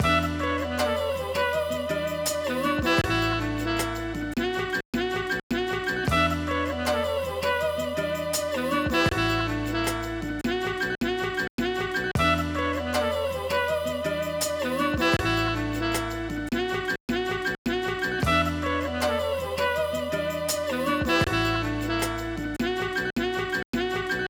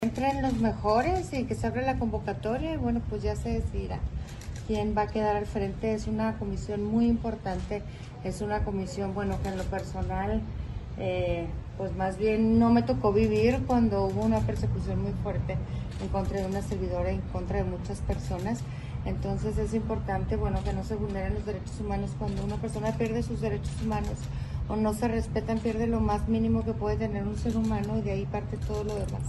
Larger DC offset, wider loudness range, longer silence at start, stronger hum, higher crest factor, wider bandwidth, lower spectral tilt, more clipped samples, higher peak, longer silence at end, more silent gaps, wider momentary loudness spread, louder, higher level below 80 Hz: neither; second, 1 LU vs 6 LU; about the same, 0 s vs 0 s; neither; about the same, 16 dB vs 16 dB; first, over 20 kHz vs 12 kHz; second, -4.5 dB/octave vs -7.5 dB/octave; neither; about the same, -10 dBFS vs -12 dBFS; about the same, 0 s vs 0 s; first, 4.85-4.93 s, 5.43-5.50 s, 11.50-11.58 s, 17.00-17.08 s, 17.58-17.65 s, 23.65-23.73 s vs none; second, 5 LU vs 9 LU; first, -26 LUFS vs -30 LUFS; about the same, -42 dBFS vs -38 dBFS